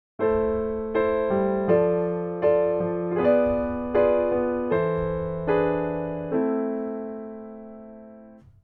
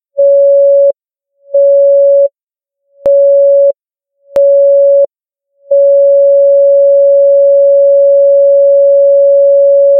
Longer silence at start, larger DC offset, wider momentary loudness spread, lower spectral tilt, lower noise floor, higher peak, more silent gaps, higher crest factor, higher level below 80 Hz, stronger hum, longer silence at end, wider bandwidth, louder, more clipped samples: about the same, 0.2 s vs 0.15 s; neither; first, 14 LU vs 6 LU; first, -11 dB/octave vs -6.5 dB/octave; second, -48 dBFS vs -83 dBFS; second, -8 dBFS vs -2 dBFS; second, none vs 2.43-2.47 s; first, 16 dB vs 6 dB; first, -48 dBFS vs -60 dBFS; neither; first, 0.25 s vs 0 s; first, 4.5 kHz vs 1.2 kHz; second, -24 LUFS vs -7 LUFS; neither